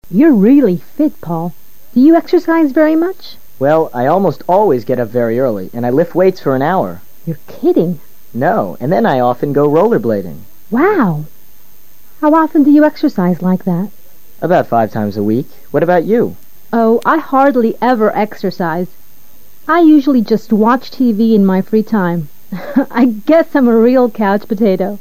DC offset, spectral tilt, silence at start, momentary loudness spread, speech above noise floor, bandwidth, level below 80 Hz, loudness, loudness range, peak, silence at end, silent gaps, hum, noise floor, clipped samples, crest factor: 4%; -8.5 dB/octave; 0 s; 11 LU; 34 dB; 15.5 kHz; -56 dBFS; -12 LUFS; 3 LU; 0 dBFS; 0.05 s; none; none; -46 dBFS; under 0.1%; 12 dB